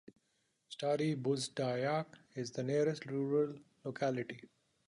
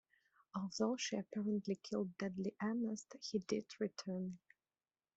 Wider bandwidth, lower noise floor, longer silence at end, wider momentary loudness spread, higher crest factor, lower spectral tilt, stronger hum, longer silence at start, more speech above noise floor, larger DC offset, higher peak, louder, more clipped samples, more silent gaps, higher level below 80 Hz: first, 11 kHz vs 8.2 kHz; second, -80 dBFS vs under -90 dBFS; second, 0.4 s vs 0.8 s; first, 13 LU vs 7 LU; about the same, 16 dB vs 18 dB; about the same, -6 dB/octave vs -5 dB/octave; neither; first, 0.7 s vs 0.55 s; second, 44 dB vs over 48 dB; neither; about the same, -22 dBFS vs -24 dBFS; first, -37 LUFS vs -42 LUFS; neither; neither; about the same, -80 dBFS vs -82 dBFS